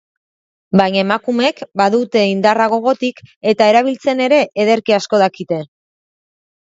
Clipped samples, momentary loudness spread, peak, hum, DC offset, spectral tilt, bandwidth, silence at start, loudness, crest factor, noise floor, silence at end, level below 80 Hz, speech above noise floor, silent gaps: under 0.1%; 7 LU; 0 dBFS; none; under 0.1%; -5.5 dB/octave; 7.8 kHz; 0.75 s; -15 LUFS; 16 dB; under -90 dBFS; 1.1 s; -60 dBFS; over 76 dB; 3.36-3.41 s